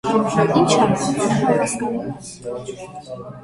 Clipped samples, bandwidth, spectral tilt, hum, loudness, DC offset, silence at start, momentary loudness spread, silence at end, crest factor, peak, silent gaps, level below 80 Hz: under 0.1%; 11.5 kHz; -5 dB/octave; none; -18 LUFS; under 0.1%; 0.05 s; 18 LU; 0 s; 18 dB; -2 dBFS; none; -52 dBFS